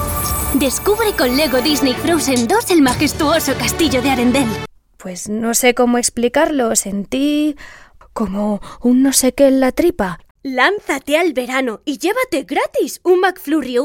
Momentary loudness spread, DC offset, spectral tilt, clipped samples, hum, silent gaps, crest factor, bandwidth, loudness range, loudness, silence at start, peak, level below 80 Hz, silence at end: 9 LU; under 0.1%; -3.5 dB/octave; under 0.1%; none; 10.31-10.35 s; 16 dB; 20 kHz; 3 LU; -15 LUFS; 0 s; 0 dBFS; -38 dBFS; 0 s